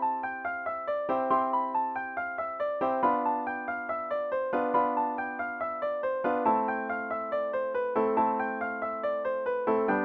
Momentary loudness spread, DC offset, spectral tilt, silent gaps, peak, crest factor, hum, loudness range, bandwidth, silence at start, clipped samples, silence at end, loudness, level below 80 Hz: 6 LU; under 0.1%; -8 dB/octave; none; -12 dBFS; 18 dB; none; 1 LU; 5.2 kHz; 0 s; under 0.1%; 0 s; -30 LUFS; -70 dBFS